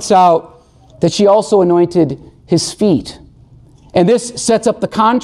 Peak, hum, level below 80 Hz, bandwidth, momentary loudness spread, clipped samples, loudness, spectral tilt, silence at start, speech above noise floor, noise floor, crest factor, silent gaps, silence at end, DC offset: -2 dBFS; none; -46 dBFS; 12.5 kHz; 8 LU; under 0.1%; -13 LUFS; -5.5 dB/octave; 0 s; 31 dB; -42 dBFS; 12 dB; none; 0 s; under 0.1%